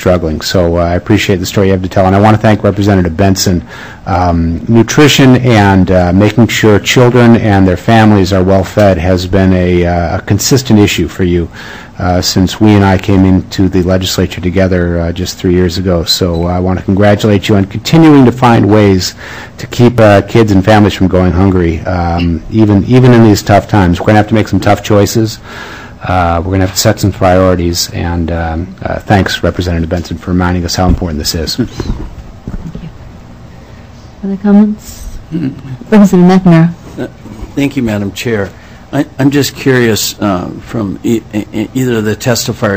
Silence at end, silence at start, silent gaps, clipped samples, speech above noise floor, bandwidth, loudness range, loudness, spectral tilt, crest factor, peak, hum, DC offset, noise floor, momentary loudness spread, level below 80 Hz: 0 s; 0 s; none; 5%; 23 dB; 16 kHz; 6 LU; -9 LUFS; -6 dB/octave; 8 dB; 0 dBFS; none; under 0.1%; -31 dBFS; 13 LU; -28 dBFS